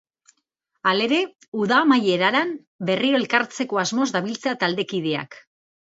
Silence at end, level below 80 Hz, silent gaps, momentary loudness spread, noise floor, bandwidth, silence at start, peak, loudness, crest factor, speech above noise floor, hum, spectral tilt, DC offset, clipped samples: 0.55 s; -72 dBFS; 1.48-1.52 s, 2.67-2.79 s; 9 LU; -75 dBFS; 8 kHz; 0.85 s; -4 dBFS; -21 LUFS; 20 dB; 53 dB; none; -4 dB/octave; under 0.1%; under 0.1%